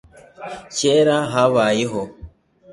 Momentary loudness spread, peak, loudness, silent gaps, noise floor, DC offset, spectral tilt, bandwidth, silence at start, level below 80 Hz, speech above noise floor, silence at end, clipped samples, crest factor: 18 LU; -2 dBFS; -18 LUFS; none; -42 dBFS; under 0.1%; -4.5 dB/octave; 11.5 kHz; 0.4 s; -50 dBFS; 24 dB; 0 s; under 0.1%; 18 dB